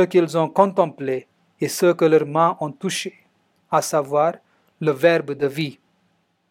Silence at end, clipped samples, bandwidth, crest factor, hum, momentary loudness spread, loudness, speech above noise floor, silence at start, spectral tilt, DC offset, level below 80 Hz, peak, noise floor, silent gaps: 0.8 s; under 0.1%; 16.5 kHz; 20 dB; none; 11 LU; -20 LUFS; 47 dB; 0 s; -5 dB/octave; under 0.1%; -76 dBFS; -2 dBFS; -66 dBFS; none